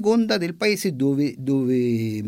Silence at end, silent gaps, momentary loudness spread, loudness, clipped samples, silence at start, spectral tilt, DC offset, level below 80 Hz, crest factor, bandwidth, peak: 0 s; none; 3 LU; -22 LUFS; under 0.1%; 0 s; -6 dB/octave; under 0.1%; -64 dBFS; 12 dB; 16.5 kHz; -8 dBFS